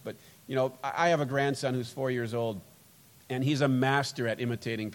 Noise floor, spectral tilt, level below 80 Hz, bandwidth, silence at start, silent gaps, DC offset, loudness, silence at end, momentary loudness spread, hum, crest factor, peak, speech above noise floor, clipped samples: -58 dBFS; -6 dB/octave; -72 dBFS; 17.5 kHz; 0.05 s; none; under 0.1%; -30 LUFS; 0 s; 9 LU; none; 20 dB; -10 dBFS; 28 dB; under 0.1%